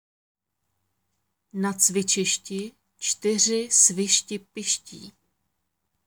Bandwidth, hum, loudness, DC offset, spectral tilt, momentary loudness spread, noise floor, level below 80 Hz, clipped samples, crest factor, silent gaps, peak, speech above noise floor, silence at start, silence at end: over 20 kHz; none; -22 LUFS; under 0.1%; -2 dB/octave; 17 LU; -78 dBFS; -74 dBFS; under 0.1%; 22 dB; none; -4 dBFS; 54 dB; 1.55 s; 0.95 s